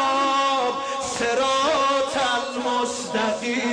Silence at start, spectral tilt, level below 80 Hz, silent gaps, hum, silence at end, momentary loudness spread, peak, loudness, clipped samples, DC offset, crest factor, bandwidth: 0 s; -2 dB/octave; -58 dBFS; none; none; 0 s; 5 LU; -12 dBFS; -22 LUFS; under 0.1%; under 0.1%; 10 dB; 10.5 kHz